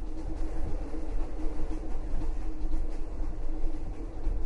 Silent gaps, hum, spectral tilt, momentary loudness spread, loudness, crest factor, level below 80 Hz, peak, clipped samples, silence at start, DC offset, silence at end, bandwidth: none; none; -8 dB/octave; 2 LU; -39 LUFS; 12 dB; -30 dBFS; -16 dBFS; under 0.1%; 0 s; under 0.1%; 0 s; 2.9 kHz